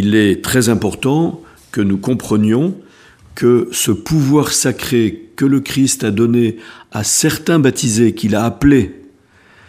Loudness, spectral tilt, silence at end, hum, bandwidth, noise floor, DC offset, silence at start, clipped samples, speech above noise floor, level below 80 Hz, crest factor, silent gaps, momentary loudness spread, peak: -14 LUFS; -5 dB/octave; 0.75 s; none; 15.5 kHz; -48 dBFS; under 0.1%; 0 s; under 0.1%; 34 dB; -40 dBFS; 14 dB; none; 8 LU; 0 dBFS